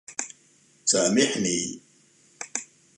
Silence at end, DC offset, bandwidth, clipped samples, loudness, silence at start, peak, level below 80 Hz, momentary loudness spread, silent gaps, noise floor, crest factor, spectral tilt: 0.35 s; under 0.1%; 11.5 kHz; under 0.1%; -25 LUFS; 0.1 s; -6 dBFS; -66 dBFS; 18 LU; none; -60 dBFS; 22 dB; -2.5 dB/octave